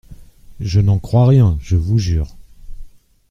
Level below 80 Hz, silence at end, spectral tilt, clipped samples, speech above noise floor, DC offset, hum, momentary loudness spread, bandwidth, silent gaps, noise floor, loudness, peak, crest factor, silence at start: -30 dBFS; 0.45 s; -8.5 dB/octave; under 0.1%; 25 dB; under 0.1%; none; 11 LU; 7.4 kHz; none; -38 dBFS; -15 LUFS; -2 dBFS; 14 dB; 0.1 s